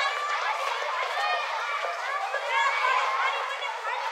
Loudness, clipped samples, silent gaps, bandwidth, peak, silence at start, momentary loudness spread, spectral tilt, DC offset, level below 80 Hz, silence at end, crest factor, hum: -27 LUFS; under 0.1%; none; 16 kHz; -12 dBFS; 0 s; 6 LU; 5 dB/octave; under 0.1%; under -90 dBFS; 0 s; 14 dB; none